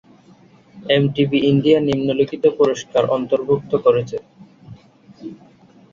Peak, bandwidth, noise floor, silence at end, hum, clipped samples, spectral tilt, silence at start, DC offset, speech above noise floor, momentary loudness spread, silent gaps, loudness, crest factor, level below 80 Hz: -2 dBFS; 7.4 kHz; -49 dBFS; 0.6 s; none; under 0.1%; -7 dB/octave; 0.75 s; under 0.1%; 32 dB; 20 LU; none; -17 LUFS; 18 dB; -54 dBFS